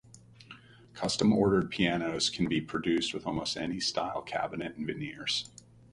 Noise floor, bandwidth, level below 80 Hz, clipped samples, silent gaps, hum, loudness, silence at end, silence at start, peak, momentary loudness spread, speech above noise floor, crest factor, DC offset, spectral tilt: -53 dBFS; 11.5 kHz; -58 dBFS; under 0.1%; none; none; -31 LUFS; 0.45 s; 0.15 s; -12 dBFS; 10 LU; 23 dB; 20 dB; under 0.1%; -4.5 dB/octave